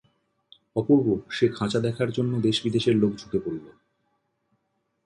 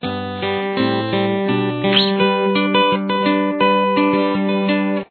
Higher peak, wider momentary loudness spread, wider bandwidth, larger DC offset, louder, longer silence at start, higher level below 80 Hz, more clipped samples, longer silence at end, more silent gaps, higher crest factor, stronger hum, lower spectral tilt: second, -8 dBFS vs -2 dBFS; first, 9 LU vs 5 LU; first, 11 kHz vs 4.6 kHz; neither; second, -25 LUFS vs -17 LUFS; first, 0.75 s vs 0 s; about the same, -58 dBFS vs -58 dBFS; neither; first, 1.35 s vs 0.05 s; neither; about the same, 18 dB vs 14 dB; neither; second, -6.5 dB/octave vs -8.5 dB/octave